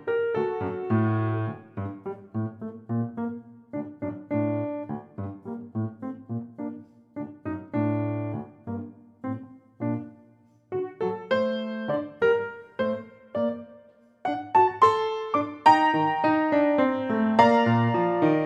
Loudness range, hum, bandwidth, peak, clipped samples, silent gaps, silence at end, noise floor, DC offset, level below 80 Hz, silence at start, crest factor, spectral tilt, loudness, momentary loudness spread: 11 LU; none; 8.4 kHz; -4 dBFS; under 0.1%; none; 0 s; -58 dBFS; under 0.1%; -74 dBFS; 0 s; 22 dB; -8 dB/octave; -26 LUFS; 17 LU